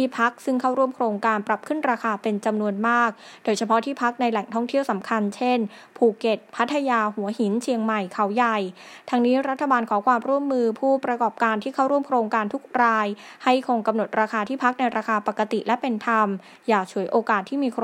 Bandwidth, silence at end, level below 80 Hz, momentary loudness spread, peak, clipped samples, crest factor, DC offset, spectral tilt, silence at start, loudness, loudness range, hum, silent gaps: 13 kHz; 0 s; -78 dBFS; 5 LU; -4 dBFS; under 0.1%; 18 dB; under 0.1%; -5.5 dB/octave; 0 s; -23 LUFS; 1 LU; none; none